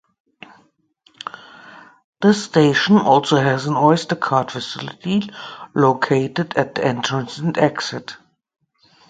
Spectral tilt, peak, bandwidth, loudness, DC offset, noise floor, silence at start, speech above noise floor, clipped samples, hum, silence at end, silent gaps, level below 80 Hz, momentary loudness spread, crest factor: -5.5 dB/octave; 0 dBFS; 9.2 kHz; -18 LUFS; under 0.1%; -59 dBFS; 1.65 s; 41 dB; under 0.1%; none; 0.95 s; 2.04-2.13 s; -60 dBFS; 18 LU; 20 dB